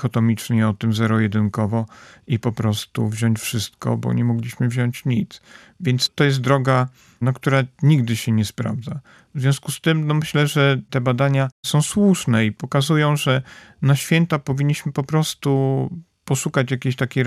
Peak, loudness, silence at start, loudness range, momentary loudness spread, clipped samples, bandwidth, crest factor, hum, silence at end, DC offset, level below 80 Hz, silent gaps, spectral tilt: -4 dBFS; -20 LUFS; 0 s; 4 LU; 8 LU; under 0.1%; 14.5 kHz; 16 dB; none; 0 s; under 0.1%; -58 dBFS; 11.52-11.63 s; -6 dB/octave